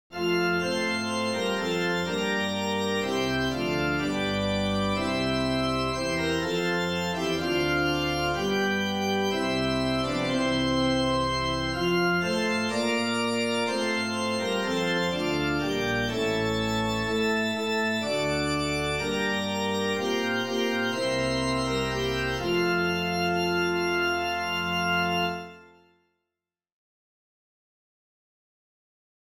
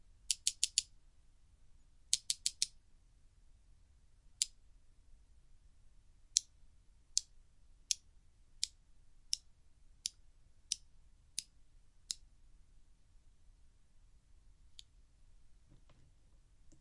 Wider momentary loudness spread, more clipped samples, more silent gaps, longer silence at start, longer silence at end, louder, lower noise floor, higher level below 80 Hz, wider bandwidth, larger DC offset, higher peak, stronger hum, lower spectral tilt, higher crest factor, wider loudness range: second, 3 LU vs 11 LU; neither; neither; second, 0.1 s vs 0.3 s; first, 3.55 s vs 0.05 s; first, -26 LUFS vs -39 LUFS; first, -89 dBFS vs -65 dBFS; first, -48 dBFS vs -66 dBFS; first, 17 kHz vs 11.5 kHz; first, 0.2% vs under 0.1%; second, -14 dBFS vs -4 dBFS; neither; first, -4.5 dB/octave vs 3 dB/octave; second, 14 dB vs 42 dB; second, 1 LU vs 12 LU